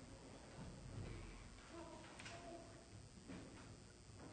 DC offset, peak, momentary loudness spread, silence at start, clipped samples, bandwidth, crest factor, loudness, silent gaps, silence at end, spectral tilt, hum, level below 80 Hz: under 0.1%; -40 dBFS; 6 LU; 0 s; under 0.1%; 9.4 kHz; 16 dB; -57 LUFS; none; 0 s; -5 dB/octave; none; -64 dBFS